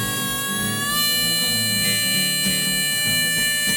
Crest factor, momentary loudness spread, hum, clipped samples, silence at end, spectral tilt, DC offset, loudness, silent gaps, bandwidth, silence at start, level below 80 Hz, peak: 14 dB; 4 LU; none; under 0.1%; 0 s; -1 dB/octave; under 0.1%; -18 LUFS; none; over 20 kHz; 0 s; -50 dBFS; -8 dBFS